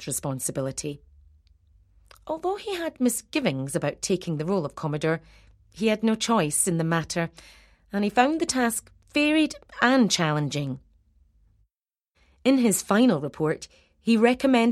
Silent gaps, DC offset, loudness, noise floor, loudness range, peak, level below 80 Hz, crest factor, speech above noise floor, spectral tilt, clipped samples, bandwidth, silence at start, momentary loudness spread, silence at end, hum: none; under 0.1%; -25 LUFS; -87 dBFS; 5 LU; -4 dBFS; -58 dBFS; 20 dB; 62 dB; -4.5 dB/octave; under 0.1%; 15.5 kHz; 0 s; 12 LU; 0 s; none